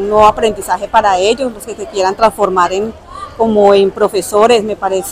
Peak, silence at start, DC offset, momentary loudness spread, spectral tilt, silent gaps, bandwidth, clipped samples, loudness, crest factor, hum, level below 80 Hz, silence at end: 0 dBFS; 0 s; under 0.1%; 12 LU; -4 dB/octave; none; 16 kHz; 0.2%; -12 LUFS; 12 dB; none; -38 dBFS; 0 s